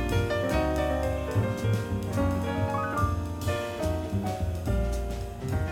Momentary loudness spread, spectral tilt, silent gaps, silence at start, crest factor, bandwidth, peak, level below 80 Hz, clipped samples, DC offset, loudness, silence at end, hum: 4 LU; -6.5 dB/octave; none; 0 s; 14 dB; 16.5 kHz; -14 dBFS; -36 dBFS; under 0.1%; under 0.1%; -29 LUFS; 0 s; none